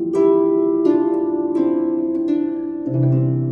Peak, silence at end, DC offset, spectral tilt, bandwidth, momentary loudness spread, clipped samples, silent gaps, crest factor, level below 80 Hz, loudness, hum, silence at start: -4 dBFS; 0 s; under 0.1%; -11 dB/octave; 4.1 kHz; 5 LU; under 0.1%; none; 14 dB; -58 dBFS; -18 LUFS; none; 0 s